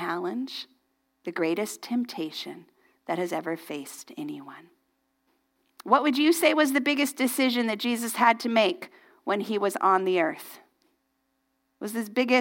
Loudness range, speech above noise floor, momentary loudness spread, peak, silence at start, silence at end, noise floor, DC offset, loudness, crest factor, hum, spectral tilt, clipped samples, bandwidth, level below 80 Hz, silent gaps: 11 LU; 49 dB; 19 LU; -6 dBFS; 0 s; 0 s; -75 dBFS; under 0.1%; -26 LUFS; 22 dB; none; -3.5 dB/octave; under 0.1%; 17 kHz; -82 dBFS; none